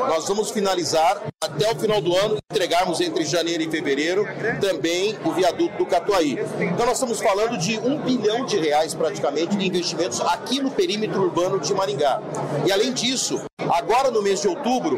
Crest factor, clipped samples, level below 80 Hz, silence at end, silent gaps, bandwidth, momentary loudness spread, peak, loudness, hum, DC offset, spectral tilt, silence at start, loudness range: 12 dB; under 0.1%; -56 dBFS; 0 s; 13.52-13.57 s; 16 kHz; 4 LU; -10 dBFS; -22 LUFS; none; under 0.1%; -4 dB/octave; 0 s; 1 LU